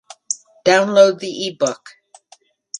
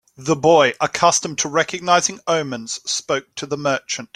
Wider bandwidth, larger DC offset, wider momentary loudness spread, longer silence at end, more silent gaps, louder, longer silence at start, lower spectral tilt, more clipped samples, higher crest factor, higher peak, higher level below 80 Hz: second, 10.5 kHz vs 14 kHz; neither; first, 13 LU vs 9 LU; about the same, 0 s vs 0.1 s; neither; about the same, -17 LUFS vs -19 LUFS; about the same, 0.3 s vs 0.2 s; about the same, -3 dB/octave vs -2.5 dB/octave; neither; about the same, 18 dB vs 18 dB; about the same, 0 dBFS vs -2 dBFS; about the same, -64 dBFS vs -60 dBFS